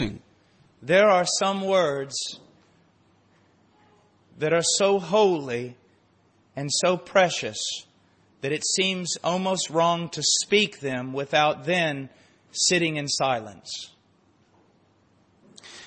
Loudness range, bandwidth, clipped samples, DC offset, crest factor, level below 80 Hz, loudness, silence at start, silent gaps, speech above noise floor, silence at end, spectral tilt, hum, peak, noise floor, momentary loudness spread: 4 LU; 8.8 kHz; under 0.1%; under 0.1%; 20 dB; -60 dBFS; -23 LUFS; 0 s; none; 38 dB; 0 s; -3 dB/octave; none; -6 dBFS; -62 dBFS; 15 LU